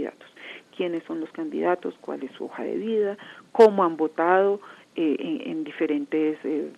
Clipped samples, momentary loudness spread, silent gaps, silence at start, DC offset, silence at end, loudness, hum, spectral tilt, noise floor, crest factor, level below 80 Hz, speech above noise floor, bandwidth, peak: under 0.1%; 17 LU; none; 0 s; under 0.1%; 0.05 s; -25 LUFS; none; -6.5 dB/octave; -44 dBFS; 22 dB; -86 dBFS; 20 dB; 10 kHz; -4 dBFS